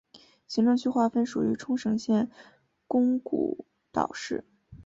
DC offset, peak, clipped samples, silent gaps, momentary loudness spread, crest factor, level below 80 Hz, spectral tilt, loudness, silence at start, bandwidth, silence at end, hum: under 0.1%; -8 dBFS; under 0.1%; none; 10 LU; 20 dB; -64 dBFS; -6 dB/octave; -28 LUFS; 0.15 s; 7.8 kHz; 0.05 s; none